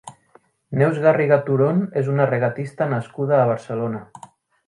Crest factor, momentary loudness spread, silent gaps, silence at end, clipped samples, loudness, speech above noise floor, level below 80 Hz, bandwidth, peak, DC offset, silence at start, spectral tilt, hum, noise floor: 20 dB; 9 LU; none; 0.65 s; under 0.1%; -20 LUFS; 37 dB; -64 dBFS; 11 kHz; 0 dBFS; under 0.1%; 0.05 s; -9 dB/octave; none; -56 dBFS